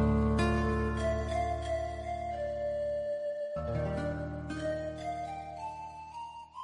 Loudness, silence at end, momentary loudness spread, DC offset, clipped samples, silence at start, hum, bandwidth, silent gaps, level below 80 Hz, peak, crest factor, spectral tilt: -34 LUFS; 0 s; 13 LU; under 0.1%; under 0.1%; 0 s; none; 11 kHz; none; -42 dBFS; -16 dBFS; 16 dB; -7.5 dB/octave